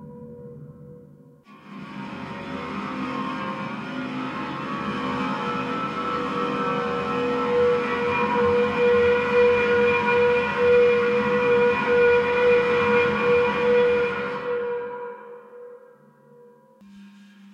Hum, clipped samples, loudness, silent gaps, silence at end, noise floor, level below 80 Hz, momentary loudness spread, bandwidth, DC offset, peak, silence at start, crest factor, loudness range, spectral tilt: none; under 0.1%; -22 LUFS; none; 0.45 s; -52 dBFS; -58 dBFS; 17 LU; 7.6 kHz; under 0.1%; -8 dBFS; 0 s; 14 dB; 13 LU; -6 dB/octave